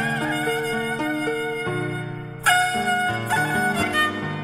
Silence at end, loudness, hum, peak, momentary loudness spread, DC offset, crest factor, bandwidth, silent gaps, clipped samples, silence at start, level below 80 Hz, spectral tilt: 0 s; -22 LUFS; none; -6 dBFS; 7 LU; under 0.1%; 18 dB; 16 kHz; none; under 0.1%; 0 s; -54 dBFS; -4 dB/octave